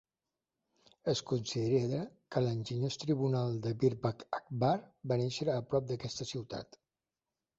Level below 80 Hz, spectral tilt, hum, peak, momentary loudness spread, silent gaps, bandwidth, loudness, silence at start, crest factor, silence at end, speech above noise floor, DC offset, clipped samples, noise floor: -68 dBFS; -6.5 dB/octave; none; -16 dBFS; 8 LU; none; 8 kHz; -35 LUFS; 1.05 s; 18 dB; 0.95 s; over 56 dB; under 0.1%; under 0.1%; under -90 dBFS